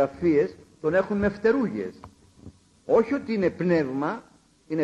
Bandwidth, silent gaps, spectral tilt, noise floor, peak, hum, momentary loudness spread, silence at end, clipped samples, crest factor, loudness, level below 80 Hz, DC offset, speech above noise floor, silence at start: 9 kHz; none; -8 dB/octave; -50 dBFS; -10 dBFS; none; 11 LU; 0 s; under 0.1%; 16 dB; -25 LUFS; -54 dBFS; under 0.1%; 26 dB; 0 s